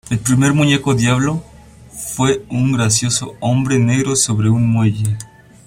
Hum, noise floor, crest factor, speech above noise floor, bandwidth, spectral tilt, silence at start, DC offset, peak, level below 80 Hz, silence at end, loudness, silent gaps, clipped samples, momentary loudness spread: none; -39 dBFS; 16 dB; 24 dB; 16 kHz; -5 dB/octave; 0.05 s; under 0.1%; 0 dBFS; -44 dBFS; 0.4 s; -15 LUFS; none; under 0.1%; 8 LU